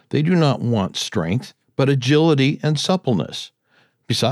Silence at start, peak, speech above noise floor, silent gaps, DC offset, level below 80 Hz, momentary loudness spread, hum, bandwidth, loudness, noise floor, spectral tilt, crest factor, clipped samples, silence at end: 0.1 s; -4 dBFS; 42 dB; none; under 0.1%; -58 dBFS; 11 LU; none; 13 kHz; -19 LUFS; -60 dBFS; -6 dB/octave; 14 dB; under 0.1%; 0 s